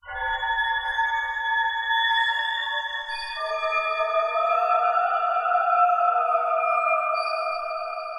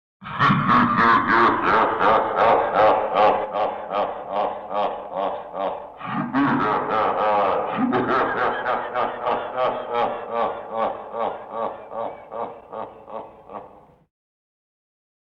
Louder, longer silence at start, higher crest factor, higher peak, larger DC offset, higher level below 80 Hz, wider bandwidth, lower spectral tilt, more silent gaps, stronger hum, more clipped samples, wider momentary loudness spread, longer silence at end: about the same, -23 LUFS vs -21 LUFS; second, 0.05 s vs 0.2 s; about the same, 14 dB vs 16 dB; second, -10 dBFS vs -6 dBFS; neither; about the same, -56 dBFS vs -56 dBFS; first, 10.5 kHz vs 7.2 kHz; second, 0.5 dB/octave vs -7.5 dB/octave; neither; neither; neither; second, 8 LU vs 16 LU; second, 0 s vs 1.55 s